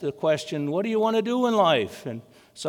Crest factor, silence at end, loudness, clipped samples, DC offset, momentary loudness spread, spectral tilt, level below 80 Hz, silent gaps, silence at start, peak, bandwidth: 16 dB; 0 s; -24 LUFS; under 0.1%; under 0.1%; 15 LU; -5.5 dB/octave; -74 dBFS; none; 0 s; -8 dBFS; 18.5 kHz